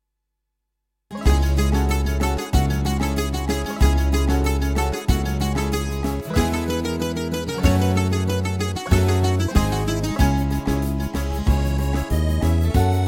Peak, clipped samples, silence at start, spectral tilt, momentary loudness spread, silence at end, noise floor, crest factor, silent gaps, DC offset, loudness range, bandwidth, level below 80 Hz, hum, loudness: -2 dBFS; under 0.1%; 1.1 s; -6 dB/octave; 6 LU; 0 s; -78 dBFS; 18 dB; none; under 0.1%; 2 LU; 17 kHz; -24 dBFS; none; -21 LUFS